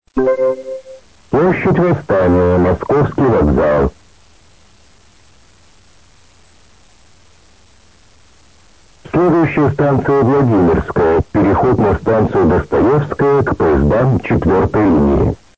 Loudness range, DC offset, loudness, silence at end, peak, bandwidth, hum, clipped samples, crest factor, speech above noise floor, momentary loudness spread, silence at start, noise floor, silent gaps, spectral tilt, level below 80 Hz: 7 LU; 0.4%; -13 LUFS; 0.25 s; -4 dBFS; 8 kHz; none; under 0.1%; 10 dB; 36 dB; 4 LU; 0.15 s; -48 dBFS; none; -9.5 dB/octave; -30 dBFS